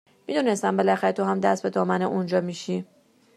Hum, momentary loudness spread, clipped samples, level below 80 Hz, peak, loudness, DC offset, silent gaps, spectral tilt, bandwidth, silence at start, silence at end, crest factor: none; 8 LU; under 0.1%; -74 dBFS; -6 dBFS; -24 LUFS; under 0.1%; none; -6 dB/octave; 12 kHz; 0.3 s; 0.5 s; 18 dB